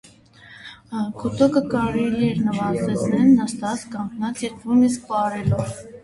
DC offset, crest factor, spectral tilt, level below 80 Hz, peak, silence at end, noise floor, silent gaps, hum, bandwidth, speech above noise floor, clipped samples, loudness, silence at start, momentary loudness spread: under 0.1%; 16 dB; -6.5 dB/octave; -48 dBFS; -6 dBFS; 0.05 s; -48 dBFS; none; none; 11.5 kHz; 27 dB; under 0.1%; -21 LUFS; 0.45 s; 13 LU